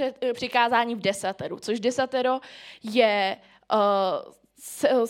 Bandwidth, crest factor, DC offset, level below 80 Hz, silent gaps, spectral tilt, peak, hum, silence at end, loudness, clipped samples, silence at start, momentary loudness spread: 16.5 kHz; 20 dB; under 0.1%; -72 dBFS; none; -3.5 dB/octave; -6 dBFS; none; 0 s; -25 LUFS; under 0.1%; 0 s; 14 LU